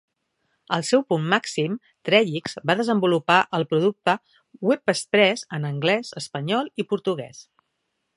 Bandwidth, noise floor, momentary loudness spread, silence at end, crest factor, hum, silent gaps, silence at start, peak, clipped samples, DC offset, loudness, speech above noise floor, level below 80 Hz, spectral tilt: 11.5 kHz; -76 dBFS; 9 LU; 0.75 s; 22 dB; none; none; 0.7 s; -2 dBFS; under 0.1%; under 0.1%; -23 LUFS; 54 dB; -70 dBFS; -5 dB/octave